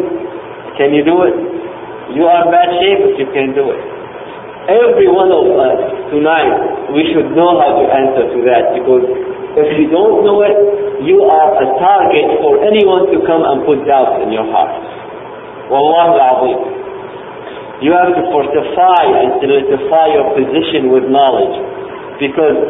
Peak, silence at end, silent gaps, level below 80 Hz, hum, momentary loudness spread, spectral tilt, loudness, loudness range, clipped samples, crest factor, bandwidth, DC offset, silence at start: 0 dBFS; 0 s; none; -48 dBFS; none; 17 LU; -9 dB/octave; -11 LUFS; 3 LU; under 0.1%; 10 dB; 3.9 kHz; under 0.1%; 0 s